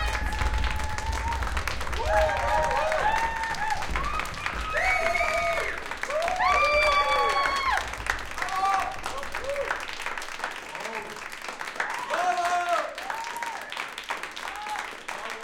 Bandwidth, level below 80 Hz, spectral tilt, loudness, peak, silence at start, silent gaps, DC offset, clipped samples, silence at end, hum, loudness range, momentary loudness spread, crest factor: 17 kHz; -38 dBFS; -3 dB/octave; -27 LUFS; -8 dBFS; 0 s; none; under 0.1%; under 0.1%; 0 s; none; 6 LU; 11 LU; 18 dB